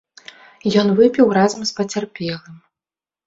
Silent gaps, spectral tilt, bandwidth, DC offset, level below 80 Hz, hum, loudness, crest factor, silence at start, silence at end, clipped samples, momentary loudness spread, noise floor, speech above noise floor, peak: none; -5.5 dB/octave; 7.8 kHz; under 0.1%; -58 dBFS; none; -17 LUFS; 16 dB; 0.65 s; 0.7 s; under 0.1%; 13 LU; under -90 dBFS; over 73 dB; -2 dBFS